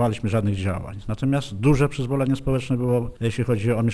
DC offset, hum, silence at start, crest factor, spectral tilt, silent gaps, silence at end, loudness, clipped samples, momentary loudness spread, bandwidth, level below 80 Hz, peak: under 0.1%; none; 0 s; 16 dB; -7.5 dB/octave; none; 0 s; -23 LUFS; under 0.1%; 6 LU; 11 kHz; -38 dBFS; -6 dBFS